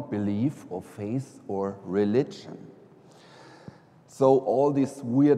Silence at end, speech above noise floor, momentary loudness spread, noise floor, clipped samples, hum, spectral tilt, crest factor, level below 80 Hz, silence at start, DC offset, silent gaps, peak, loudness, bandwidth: 0 s; 27 dB; 21 LU; -53 dBFS; under 0.1%; none; -8 dB/octave; 20 dB; -72 dBFS; 0 s; under 0.1%; none; -8 dBFS; -26 LUFS; 11.5 kHz